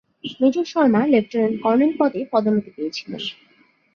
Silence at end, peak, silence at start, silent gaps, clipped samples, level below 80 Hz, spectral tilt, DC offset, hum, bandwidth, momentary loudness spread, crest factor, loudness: 0.65 s; -4 dBFS; 0.25 s; none; under 0.1%; -66 dBFS; -6.5 dB/octave; under 0.1%; none; 6.8 kHz; 12 LU; 16 dB; -20 LUFS